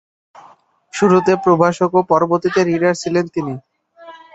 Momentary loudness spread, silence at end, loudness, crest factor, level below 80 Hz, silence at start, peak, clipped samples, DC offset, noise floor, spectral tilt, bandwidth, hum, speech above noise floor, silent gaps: 11 LU; 0.2 s; -15 LUFS; 16 dB; -56 dBFS; 0.95 s; 0 dBFS; under 0.1%; under 0.1%; -49 dBFS; -6.5 dB/octave; 8.2 kHz; none; 34 dB; none